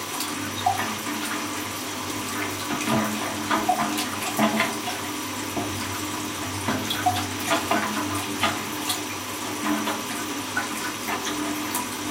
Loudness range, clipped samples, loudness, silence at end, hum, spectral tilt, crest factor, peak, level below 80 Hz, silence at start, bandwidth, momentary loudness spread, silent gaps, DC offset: 2 LU; under 0.1%; -26 LUFS; 0 s; none; -2.5 dB/octave; 20 dB; -8 dBFS; -60 dBFS; 0 s; 17 kHz; 6 LU; none; under 0.1%